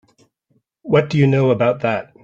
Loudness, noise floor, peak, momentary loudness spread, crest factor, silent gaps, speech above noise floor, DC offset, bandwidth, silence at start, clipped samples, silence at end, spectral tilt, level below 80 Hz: -17 LUFS; -65 dBFS; -2 dBFS; 7 LU; 16 dB; none; 49 dB; under 0.1%; 7.2 kHz; 0.85 s; under 0.1%; 0.2 s; -8 dB/octave; -54 dBFS